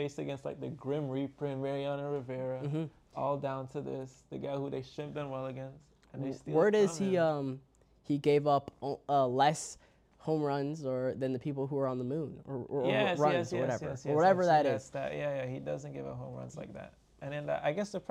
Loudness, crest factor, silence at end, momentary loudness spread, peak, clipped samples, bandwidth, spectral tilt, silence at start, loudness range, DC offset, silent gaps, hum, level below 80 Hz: -33 LUFS; 18 dB; 0.1 s; 15 LU; -14 dBFS; under 0.1%; 12.5 kHz; -6 dB/octave; 0 s; 8 LU; under 0.1%; none; none; -68 dBFS